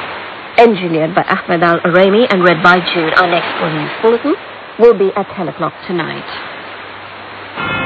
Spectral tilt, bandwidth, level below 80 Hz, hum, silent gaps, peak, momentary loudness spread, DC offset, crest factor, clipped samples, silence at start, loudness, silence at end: -7 dB/octave; 8 kHz; -50 dBFS; none; none; 0 dBFS; 17 LU; under 0.1%; 14 dB; 0.5%; 0 s; -12 LUFS; 0 s